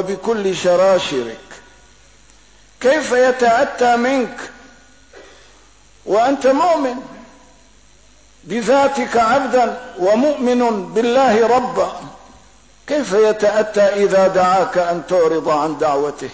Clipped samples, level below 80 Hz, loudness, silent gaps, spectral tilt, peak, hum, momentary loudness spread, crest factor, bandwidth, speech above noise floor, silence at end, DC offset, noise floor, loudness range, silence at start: under 0.1%; -52 dBFS; -16 LUFS; none; -4.5 dB/octave; -4 dBFS; none; 9 LU; 12 dB; 8 kHz; 34 dB; 0 s; 0.3%; -49 dBFS; 5 LU; 0 s